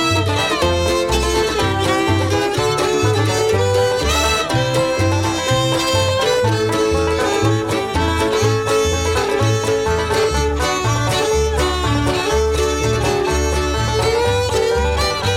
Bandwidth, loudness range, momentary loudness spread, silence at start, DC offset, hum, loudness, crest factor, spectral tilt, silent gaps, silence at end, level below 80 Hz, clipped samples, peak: 16.5 kHz; 1 LU; 2 LU; 0 s; under 0.1%; none; -17 LUFS; 14 dB; -4.5 dB/octave; none; 0 s; -28 dBFS; under 0.1%; -4 dBFS